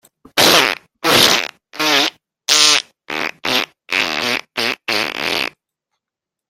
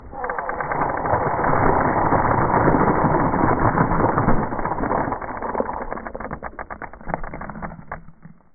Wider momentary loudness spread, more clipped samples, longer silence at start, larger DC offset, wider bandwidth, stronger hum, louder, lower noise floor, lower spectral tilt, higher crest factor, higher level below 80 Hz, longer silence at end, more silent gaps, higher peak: second, 12 LU vs 16 LU; neither; first, 0.35 s vs 0 s; neither; first, 17 kHz vs 2.5 kHz; neither; first, -15 LUFS vs -21 LUFS; first, -85 dBFS vs -43 dBFS; second, -0.5 dB/octave vs -15.5 dB/octave; about the same, 18 dB vs 18 dB; second, -58 dBFS vs -32 dBFS; first, 1 s vs 0.2 s; neither; about the same, 0 dBFS vs -2 dBFS